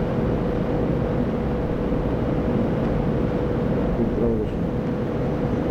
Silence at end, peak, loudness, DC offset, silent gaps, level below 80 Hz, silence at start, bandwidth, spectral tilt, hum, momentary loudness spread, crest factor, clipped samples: 0 s; -10 dBFS; -23 LUFS; under 0.1%; none; -32 dBFS; 0 s; 8 kHz; -9.5 dB/octave; none; 2 LU; 12 dB; under 0.1%